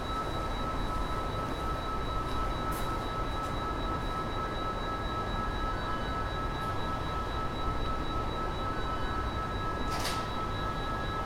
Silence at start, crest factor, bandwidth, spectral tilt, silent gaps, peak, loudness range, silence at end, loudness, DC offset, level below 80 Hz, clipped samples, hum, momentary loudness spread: 0 s; 14 dB; 16 kHz; -5.5 dB/octave; none; -20 dBFS; 0 LU; 0 s; -34 LUFS; under 0.1%; -38 dBFS; under 0.1%; none; 1 LU